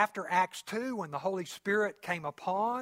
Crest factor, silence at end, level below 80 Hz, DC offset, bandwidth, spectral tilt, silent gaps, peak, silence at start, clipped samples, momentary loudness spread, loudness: 20 dB; 0 s; -78 dBFS; under 0.1%; 16 kHz; -4.5 dB/octave; none; -12 dBFS; 0 s; under 0.1%; 6 LU; -33 LUFS